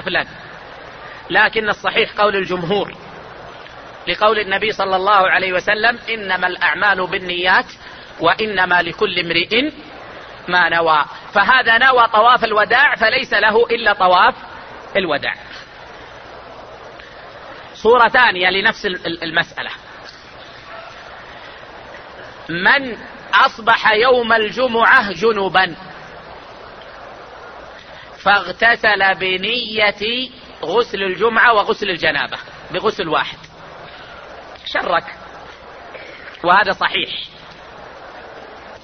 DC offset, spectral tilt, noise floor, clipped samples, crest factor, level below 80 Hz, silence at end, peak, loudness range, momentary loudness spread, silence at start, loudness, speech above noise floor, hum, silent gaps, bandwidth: under 0.1%; -4.5 dB/octave; -38 dBFS; under 0.1%; 18 dB; -50 dBFS; 0.05 s; 0 dBFS; 9 LU; 24 LU; 0 s; -15 LUFS; 22 dB; none; none; 6.6 kHz